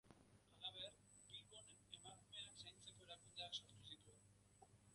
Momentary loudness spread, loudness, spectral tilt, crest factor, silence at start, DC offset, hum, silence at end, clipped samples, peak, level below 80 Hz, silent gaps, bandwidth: 10 LU; -57 LUFS; -2 dB/octave; 24 dB; 0.05 s; under 0.1%; 50 Hz at -75 dBFS; 0 s; under 0.1%; -38 dBFS; -82 dBFS; none; 11.5 kHz